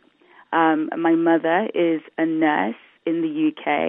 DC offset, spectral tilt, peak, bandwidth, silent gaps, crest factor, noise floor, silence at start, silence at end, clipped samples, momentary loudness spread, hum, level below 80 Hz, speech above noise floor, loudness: under 0.1%; -10 dB/octave; -4 dBFS; 3.7 kHz; none; 18 dB; -53 dBFS; 0.5 s; 0 s; under 0.1%; 7 LU; none; -74 dBFS; 33 dB; -21 LUFS